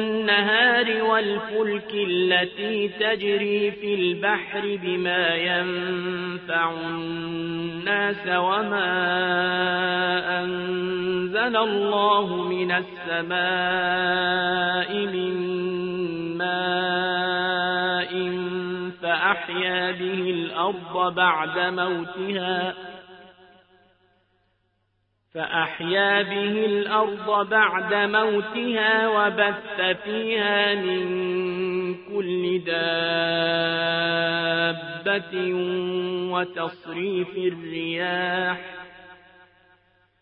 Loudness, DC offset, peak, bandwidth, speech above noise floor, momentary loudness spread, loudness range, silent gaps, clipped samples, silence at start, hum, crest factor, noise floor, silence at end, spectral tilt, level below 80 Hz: -23 LUFS; under 0.1%; -6 dBFS; 4.6 kHz; 47 dB; 8 LU; 5 LU; none; under 0.1%; 0 s; none; 18 dB; -71 dBFS; 1.05 s; -9 dB/octave; -66 dBFS